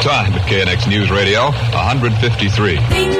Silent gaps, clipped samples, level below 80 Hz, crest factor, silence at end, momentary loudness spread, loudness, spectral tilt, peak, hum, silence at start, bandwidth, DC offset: none; under 0.1%; -30 dBFS; 12 dB; 0 s; 2 LU; -14 LUFS; -5.5 dB/octave; -2 dBFS; none; 0 s; 13 kHz; under 0.1%